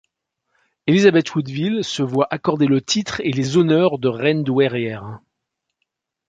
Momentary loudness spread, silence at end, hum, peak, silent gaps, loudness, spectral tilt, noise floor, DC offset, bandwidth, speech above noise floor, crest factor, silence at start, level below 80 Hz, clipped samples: 10 LU; 1.1 s; none; -2 dBFS; none; -18 LUFS; -5.5 dB/octave; -79 dBFS; under 0.1%; 9.2 kHz; 61 dB; 18 dB; 0.85 s; -58 dBFS; under 0.1%